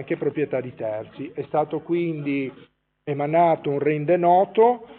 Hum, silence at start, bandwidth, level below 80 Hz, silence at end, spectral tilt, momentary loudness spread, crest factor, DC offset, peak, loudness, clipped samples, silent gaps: none; 0 s; 4.3 kHz; -68 dBFS; 0 s; -6.5 dB/octave; 14 LU; 16 dB; under 0.1%; -6 dBFS; -22 LUFS; under 0.1%; none